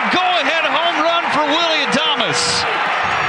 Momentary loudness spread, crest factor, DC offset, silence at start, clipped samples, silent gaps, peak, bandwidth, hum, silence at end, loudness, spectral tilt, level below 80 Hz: 2 LU; 14 dB; under 0.1%; 0 s; under 0.1%; none; -2 dBFS; 12 kHz; none; 0 s; -15 LUFS; -2 dB/octave; -52 dBFS